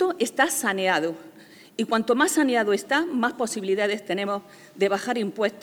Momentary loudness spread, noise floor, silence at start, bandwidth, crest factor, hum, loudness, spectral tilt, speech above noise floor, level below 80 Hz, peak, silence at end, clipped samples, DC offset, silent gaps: 9 LU; -49 dBFS; 0 s; over 20 kHz; 18 dB; none; -24 LUFS; -3 dB/octave; 25 dB; -76 dBFS; -6 dBFS; 0 s; under 0.1%; under 0.1%; none